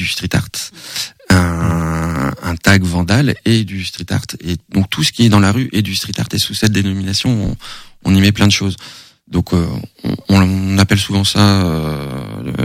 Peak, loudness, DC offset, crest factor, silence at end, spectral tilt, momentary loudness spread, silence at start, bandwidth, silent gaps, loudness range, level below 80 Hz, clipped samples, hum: 0 dBFS; -15 LUFS; under 0.1%; 14 dB; 0 s; -5 dB/octave; 12 LU; 0 s; 16 kHz; none; 1 LU; -34 dBFS; under 0.1%; none